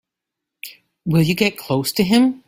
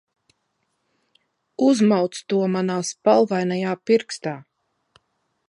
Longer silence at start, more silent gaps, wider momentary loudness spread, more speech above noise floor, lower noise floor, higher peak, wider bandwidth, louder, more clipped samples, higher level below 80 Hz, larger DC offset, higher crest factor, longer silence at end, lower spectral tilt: second, 0.65 s vs 1.6 s; neither; first, 20 LU vs 12 LU; first, 66 dB vs 53 dB; first, -83 dBFS vs -73 dBFS; about the same, -2 dBFS vs -4 dBFS; first, 16.5 kHz vs 11 kHz; first, -18 LUFS vs -21 LUFS; neither; first, -52 dBFS vs -72 dBFS; neither; about the same, 18 dB vs 20 dB; second, 0.1 s vs 1.05 s; about the same, -5.5 dB/octave vs -5.5 dB/octave